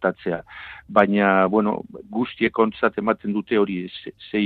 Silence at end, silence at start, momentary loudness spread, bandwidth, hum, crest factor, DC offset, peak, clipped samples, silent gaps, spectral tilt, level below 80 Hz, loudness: 0 s; 0 s; 14 LU; 4.6 kHz; none; 20 dB; under 0.1%; -2 dBFS; under 0.1%; none; -9 dB/octave; -58 dBFS; -22 LUFS